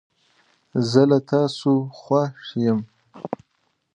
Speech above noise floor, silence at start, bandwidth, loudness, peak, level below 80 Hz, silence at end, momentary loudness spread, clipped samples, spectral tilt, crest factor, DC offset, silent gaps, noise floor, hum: 50 dB; 0.75 s; 9.8 kHz; -21 LUFS; -2 dBFS; -66 dBFS; 0.6 s; 16 LU; under 0.1%; -7.5 dB/octave; 20 dB; under 0.1%; none; -70 dBFS; none